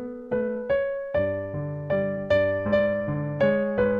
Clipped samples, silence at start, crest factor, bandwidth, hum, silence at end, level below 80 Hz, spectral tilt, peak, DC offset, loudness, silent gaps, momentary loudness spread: under 0.1%; 0 s; 14 dB; 5.2 kHz; none; 0 s; -50 dBFS; -9 dB/octave; -10 dBFS; under 0.1%; -25 LUFS; none; 7 LU